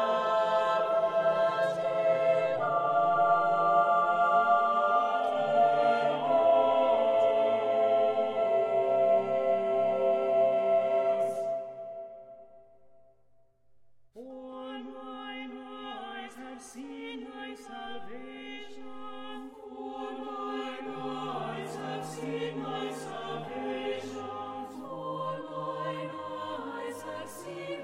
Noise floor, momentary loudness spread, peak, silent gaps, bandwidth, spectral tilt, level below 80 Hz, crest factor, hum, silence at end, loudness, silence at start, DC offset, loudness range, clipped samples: -66 dBFS; 18 LU; -14 dBFS; none; 11.5 kHz; -5.5 dB/octave; -74 dBFS; 16 dB; none; 0 s; -28 LUFS; 0 s; under 0.1%; 17 LU; under 0.1%